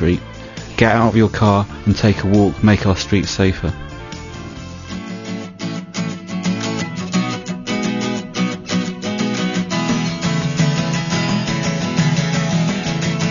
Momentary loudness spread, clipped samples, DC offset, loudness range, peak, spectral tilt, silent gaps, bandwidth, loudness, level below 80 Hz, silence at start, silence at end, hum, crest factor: 14 LU; under 0.1%; under 0.1%; 8 LU; 0 dBFS; -5.5 dB/octave; none; 7.4 kHz; -18 LUFS; -38 dBFS; 0 s; 0 s; none; 18 dB